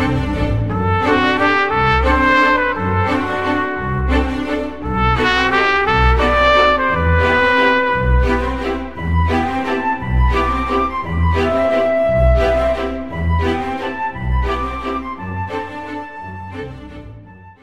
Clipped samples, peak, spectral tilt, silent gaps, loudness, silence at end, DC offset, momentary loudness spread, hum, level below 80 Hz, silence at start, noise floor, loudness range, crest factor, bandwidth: under 0.1%; 0 dBFS; -6.5 dB/octave; none; -16 LUFS; 0 s; 2%; 12 LU; none; -24 dBFS; 0 s; -39 dBFS; 8 LU; 16 dB; 9.8 kHz